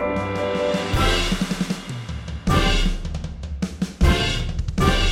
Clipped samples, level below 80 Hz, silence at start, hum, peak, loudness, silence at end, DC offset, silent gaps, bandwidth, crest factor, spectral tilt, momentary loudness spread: under 0.1%; -26 dBFS; 0 s; none; -6 dBFS; -23 LUFS; 0 s; under 0.1%; none; 15.5 kHz; 16 dB; -5 dB/octave; 12 LU